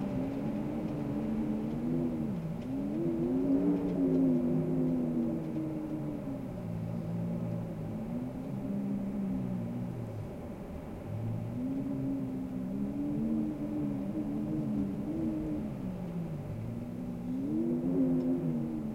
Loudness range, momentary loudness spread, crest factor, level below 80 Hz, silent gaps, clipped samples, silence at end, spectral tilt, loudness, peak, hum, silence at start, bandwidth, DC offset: 6 LU; 9 LU; 16 dB; -54 dBFS; none; under 0.1%; 0 s; -9.5 dB/octave; -34 LUFS; -18 dBFS; none; 0 s; 15.5 kHz; under 0.1%